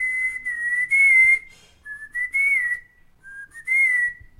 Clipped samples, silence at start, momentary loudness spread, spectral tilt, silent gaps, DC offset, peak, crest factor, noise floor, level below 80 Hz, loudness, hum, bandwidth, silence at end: under 0.1%; 0 s; 20 LU; 0 dB/octave; none; under 0.1%; -8 dBFS; 14 dB; -49 dBFS; -56 dBFS; -18 LUFS; none; 15.5 kHz; 0.25 s